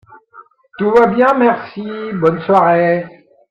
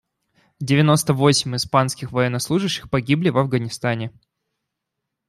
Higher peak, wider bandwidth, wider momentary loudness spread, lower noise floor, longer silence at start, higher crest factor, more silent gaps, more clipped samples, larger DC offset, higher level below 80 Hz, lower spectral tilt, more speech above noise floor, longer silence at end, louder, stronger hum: about the same, 0 dBFS vs -2 dBFS; second, 7.2 kHz vs 15 kHz; first, 13 LU vs 8 LU; second, -44 dBFS vs -81 dBFS; second, 0.35 s vs 0.6 s; about the same, 14 dB vs 18 dB; neither; neither; neither; about the same, -54 dBFS vs -54 dBFS; first, -8 dB/octave vs -5 dB/octave; second, 31 dB vs 61 dB; second, 0.4 s vs 1.2 s; first, -14 LUFS vs -20 LUFS; neither